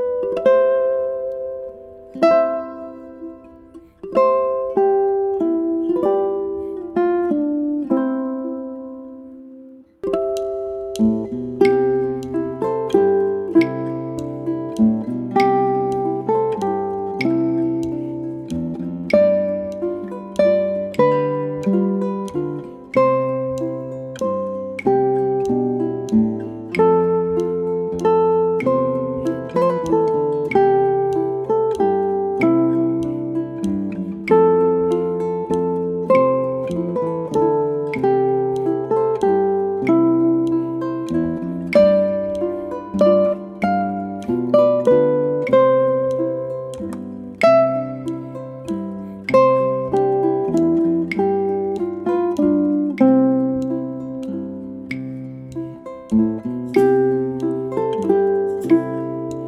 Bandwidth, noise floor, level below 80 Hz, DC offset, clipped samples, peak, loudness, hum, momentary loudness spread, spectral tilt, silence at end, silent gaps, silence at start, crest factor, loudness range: 11.5 kHz; -43 dBFS; -52 dBFS; under 0.1%; under 0.1%; -2 dBFS; -19 LUFS; none; 12 LU; -8 dB/octave; 0 s; none; 0 s; 18 dB; 4 LU